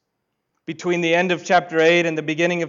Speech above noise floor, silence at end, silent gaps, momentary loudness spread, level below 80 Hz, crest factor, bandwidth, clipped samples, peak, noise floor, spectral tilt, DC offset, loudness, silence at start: 57 dB; 0 s; none; 13 LU; -68 dBFS; 14 dB; 7.6 kHz; under 0.1%; -6 dBFS; -76 dBFS; -5 dB/octave; under 0.1%; -19 LUFS; 0.7 s